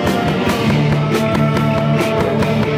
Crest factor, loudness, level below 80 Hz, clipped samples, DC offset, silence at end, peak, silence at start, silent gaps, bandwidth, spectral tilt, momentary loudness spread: 10 dB; -15 LUFS; -38 dBFS; under 0.1%; under 0.1%; 0 s; -4 dBFS; 0 s; none; 16 kHz; -6.5 dB/octave; 1 LU